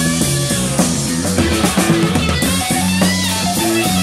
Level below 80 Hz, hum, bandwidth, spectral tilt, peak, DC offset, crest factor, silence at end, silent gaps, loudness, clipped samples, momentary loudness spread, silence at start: -32 dBFS; none; 16 kHz; -4 dB/octave; -2 dBFS; under 0.1%; 14 dB; 0 s; none; -15 LUFS; under 0.1%; 2 LU; 0 s